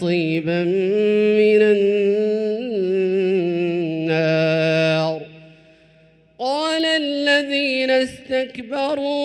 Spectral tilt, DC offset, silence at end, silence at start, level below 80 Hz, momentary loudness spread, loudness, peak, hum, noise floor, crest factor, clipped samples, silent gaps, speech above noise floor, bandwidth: -6 dB/octave; under 0.1%; 0 s; 0 s; -62 dBFS; 8 LU; -19 LUFS; -4 dBFS; none; -53 dBFS; 16 dB; under 0.1%; none; 35 dB; 11 kHz